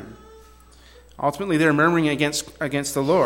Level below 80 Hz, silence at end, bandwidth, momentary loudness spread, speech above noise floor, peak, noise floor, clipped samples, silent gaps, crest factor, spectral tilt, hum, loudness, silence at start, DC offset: -52 dBFS; 0 s; 17 kHz; 9 LU; 28 dB; -6 dBFS; -49 dBFS; under 0.1%; none; 16 dB; -5 dB/octave; none; -21 LUFS; 0 s; under 0.1%